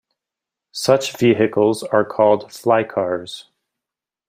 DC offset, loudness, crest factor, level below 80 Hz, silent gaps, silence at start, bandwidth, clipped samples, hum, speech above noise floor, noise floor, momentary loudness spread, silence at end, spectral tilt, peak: under 0.1%; -18 LUFS; 18 dB; -64 dBFS; none; 0.75 s; 16 kHz; under 0.1%; none; 69 dB; -87 dBFS; 11 LU; 0.9 s; -5 dB/octave; -2 dBFS